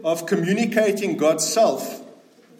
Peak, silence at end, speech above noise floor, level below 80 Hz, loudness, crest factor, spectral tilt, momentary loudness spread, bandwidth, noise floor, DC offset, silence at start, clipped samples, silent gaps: -6 dBFS; 0.45 s; 29 dB; -76 dBFS; -20 LUFS; 16 dB; -4 dB/octave; 11 LU; 16.5 kHz; -49 dBFS; under 0.1%; 0 s; under 0.1%; none